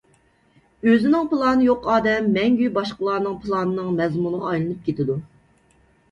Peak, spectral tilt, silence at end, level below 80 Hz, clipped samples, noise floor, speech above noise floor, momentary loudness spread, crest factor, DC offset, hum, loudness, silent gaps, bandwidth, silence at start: -6 dBFS; -7.5 dB/octave; 0.85 s; -54 dBFS; under 0.1%; -59 dBFS; 39 dB; 7 LU; 16 dB; under 0.1%; none; -21 LUFS; none; 7.4 kHz; 0.85 s